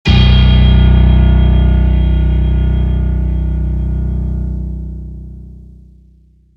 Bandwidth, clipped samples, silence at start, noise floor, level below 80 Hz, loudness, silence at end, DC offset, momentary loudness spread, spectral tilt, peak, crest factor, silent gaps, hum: 5.6 kHz; under 0.1%; 0.05 s; -46 dBFS; -12 dBFS; -13 LUFS; 0.95 s; under 0.1%; 16 LU; -8.5 dB/octave; 0 dBFS; 12 dB; none; none